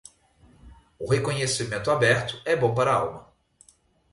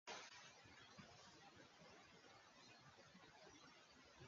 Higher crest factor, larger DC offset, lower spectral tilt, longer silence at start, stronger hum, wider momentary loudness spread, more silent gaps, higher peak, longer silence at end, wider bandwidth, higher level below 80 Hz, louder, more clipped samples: about the same, 18 dB vs 22 dB; neither; first, -4.5 dB/octave vs -1.5 dB/octave; first, 0.65 s vs 0.05 s; neither; first, 9 LU vs 6 LU; neither; first, -8 dBFS vs -42 dBFS; first, 0.9 s vs 0 s; first, 11.5 kHz vs 7.4 kHz; first, -54 dBFS vs -88 dBFS; first, -24 LUFS vs -64 LUFS; neither